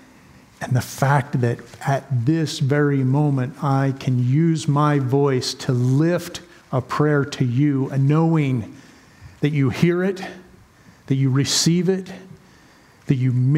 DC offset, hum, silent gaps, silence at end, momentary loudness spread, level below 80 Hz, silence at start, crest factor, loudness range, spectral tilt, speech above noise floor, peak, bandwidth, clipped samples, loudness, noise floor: under 0.1%; none; none; 0 s; 9 LU; -58 dBFS; 0.6 s; 18 dB; 3 LU; -6 dB/octave; 31 dB; -2 dBFS; 15.5 kHz; under 0.1%; -20 LUFS; -50 dBFS